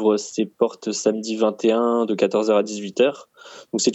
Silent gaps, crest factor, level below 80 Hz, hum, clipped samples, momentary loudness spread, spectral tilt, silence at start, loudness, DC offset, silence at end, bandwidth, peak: none; 16 dB; -74 dBFS; none; under 0.1%; 7 LU; -4 dB/octave; 0 s; -21 LUFS; under 0.1%; 0 s; 8.4 kHz; -4 dBFS